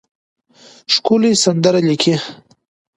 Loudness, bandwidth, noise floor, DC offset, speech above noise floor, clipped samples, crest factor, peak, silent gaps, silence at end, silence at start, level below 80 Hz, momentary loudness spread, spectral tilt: -14 LUFS; 11.5 kHz; -46 dBFS; under 0.1%; 32 dB; under 0.1%; 16 dB; 0 dBFS; none; 0.6 s; 0.9 s; -62 dBFS; 12 LU; -4.5 dB/octave